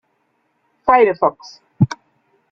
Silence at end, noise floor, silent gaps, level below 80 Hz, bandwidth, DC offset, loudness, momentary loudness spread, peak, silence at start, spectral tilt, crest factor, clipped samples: 0.6 s; -66 dBFS; none; -54 dBFS; 7.6 kHz; under 0.1%; -16 LUFS; 10 LU; -2 dBFS; 0.85 s; -7.5 dB/octave; 18 dB; under 0.1%